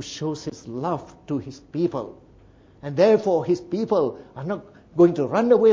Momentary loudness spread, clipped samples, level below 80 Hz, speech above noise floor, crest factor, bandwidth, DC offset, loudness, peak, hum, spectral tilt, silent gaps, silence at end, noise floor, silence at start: 15 LU; under 0.1%; -58 dBFS; 30 dB; 18 dB; 7.6 kHz; under 0.1%; -23 LUFS; -6 dBFS; none; -7 dB/octave; none; 0 s; -51 dBFS; 0 s